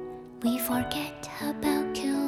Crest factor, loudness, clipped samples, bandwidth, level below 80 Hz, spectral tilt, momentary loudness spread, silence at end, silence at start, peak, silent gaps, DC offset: 16 dB; -30 LUFS; under 0.1%; 19 kHz; -56 dBFS; -4 dB/octave; 7 LU; 0 s; 0 s; -14 dBFS; none; under 0.1%